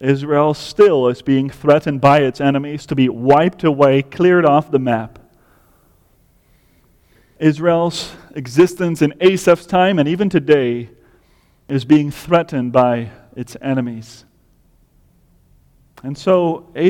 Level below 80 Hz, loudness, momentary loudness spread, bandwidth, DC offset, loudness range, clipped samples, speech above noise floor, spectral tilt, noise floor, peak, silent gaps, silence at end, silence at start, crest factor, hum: -52 dBFS; -15 LUFS; 14 LU; 16 kHz; under 0.1%; 8 LU; under 0.1%; 40 dB; -7 dB/octave; -55 dBFS; 0 dBFS; none; 0 s; 0 s; 16 dB; none